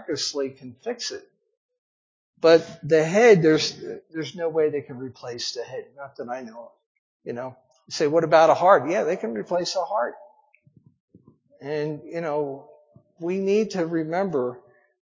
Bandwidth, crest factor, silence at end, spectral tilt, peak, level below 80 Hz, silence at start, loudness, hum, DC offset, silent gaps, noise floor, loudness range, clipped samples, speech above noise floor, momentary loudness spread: 7.6 kHz; 22 dB; 0.55 s; -5 dB/octave; -2 dBFS; -72 dBFS; 0 s; -23 LUFS; none; under 0.1%; 1.57-1.69 s, 1.78-2.33 s, 6.86-7.20 s, 11.00-11.08 s; -59 dBFS; 11 LU; under 0.1%; 36 dB; 19 LU